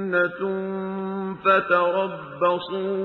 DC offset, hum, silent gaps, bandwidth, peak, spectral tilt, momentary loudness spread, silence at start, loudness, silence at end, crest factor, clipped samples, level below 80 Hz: under 0.1%; none; none; 5.6 kHz; -6 dBFS; -8 dB/octave; 10 LU; 0 s; -23 LUFS; 0 s; 18 dB; under 0.1%; -66 dBFS